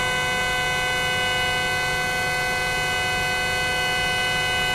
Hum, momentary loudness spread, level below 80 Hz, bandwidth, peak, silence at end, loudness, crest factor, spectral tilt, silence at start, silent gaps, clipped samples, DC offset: none; 1 LU; -42 dBFS; 15.5 kHz; -10 dBFS; 0 s; -21 LUFS; 12 dB; -2 dB/octave; 0 s; none; under 0.1%; under 0.1%